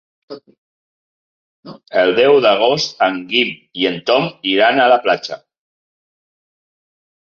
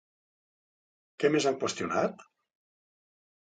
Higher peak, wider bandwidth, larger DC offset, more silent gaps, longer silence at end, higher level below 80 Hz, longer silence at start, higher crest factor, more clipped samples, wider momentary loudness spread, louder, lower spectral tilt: first, 0 dBFS vs -12 dBFS; second, 7.2 kHz vs 9.4 kHz; neither; first, 0.58-1.63 s vs none; first, 2.05 s vs 1.2 s; first, -64 dBFS vs -72 dBFS; second, 0.3 s vs 1.2 s; second, 16 dB vs 22 dB; neither; first, 9 LU vs 6 LU; first, -14 LUFS vs -29 LUFS; about the same, -4 dB/octave vs -4 dB/octave